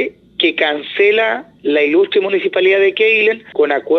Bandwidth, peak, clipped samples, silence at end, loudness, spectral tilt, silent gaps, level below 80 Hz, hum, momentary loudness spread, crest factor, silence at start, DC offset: 6 kHz; 0 dBFS; under 0.1%; 0 s; -14 LUFS; -5.5 dB/octave; none; -64 dBFS; none; 6 LU; 14 dB; 0 s; under 0.1%